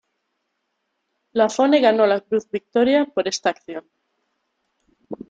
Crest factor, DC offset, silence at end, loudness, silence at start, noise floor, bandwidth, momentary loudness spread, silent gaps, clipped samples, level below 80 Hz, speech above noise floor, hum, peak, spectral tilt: 18 dB; under 0.1%; 0.15 s; -19 LUFS; 1.35 s; -75 dBFS; 9 kHz; 18 LU; none; under 0.1%; -68 dBFS; 56 dB; none; -4 dBFS; -4 dB/octave